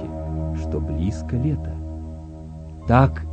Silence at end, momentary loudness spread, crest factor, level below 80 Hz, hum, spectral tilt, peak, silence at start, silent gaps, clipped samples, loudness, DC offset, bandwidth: 0 s; 20 LU; 24 dB; -32 dBFS; none; -9 dB/octave; 0 dBFS; 0 s; none; under 0.1%; -23 LUFS; under 0.1%; 8.6 kHz